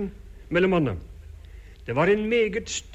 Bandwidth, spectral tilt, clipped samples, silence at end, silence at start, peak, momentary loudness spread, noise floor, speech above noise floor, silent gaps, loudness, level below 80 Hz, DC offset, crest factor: 8.6 kHz; -5.5 dB/octave; under 0.1%; 0 s; 0 s; -10 dBFS; 23 LU; -44 dBFS; 21 dB; none; -24 LUFS; -44 dBFS; under 0.1%; 16 dB